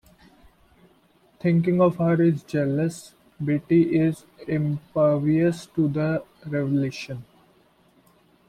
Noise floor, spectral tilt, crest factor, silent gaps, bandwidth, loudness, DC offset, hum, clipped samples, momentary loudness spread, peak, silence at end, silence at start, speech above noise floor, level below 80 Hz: -60 dBFS; -8.5 dB/octave; 16 dB; none; 12 kHz; -23 LUFS; under 0.1%; none; under 0.1%; 11 LU; -8 dBFS; 1.25 s; 1.45 s; 37 dB; -58 dBFS